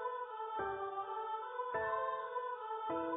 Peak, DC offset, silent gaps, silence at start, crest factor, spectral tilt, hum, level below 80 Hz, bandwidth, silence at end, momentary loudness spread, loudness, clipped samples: -26 dBFS; under 0.1%; none; 0 s; 14 dB; 1.5 dB/octave; none; -72 dBFS; 3.8 kHz; 0 s; 5 LU; -41 LUFS; under 0.1%